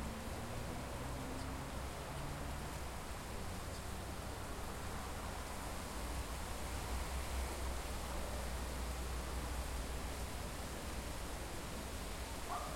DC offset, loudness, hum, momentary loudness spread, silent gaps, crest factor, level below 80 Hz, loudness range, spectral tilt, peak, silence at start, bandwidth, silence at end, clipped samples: under 0.1%; -45 LUFS; none; 3 LU; none; 14 dB; -46 dBFS; 2 LU; -4 dB/octave; -28 dBFS; 0 s; 16.5 kHz; 0 s; under 0.1%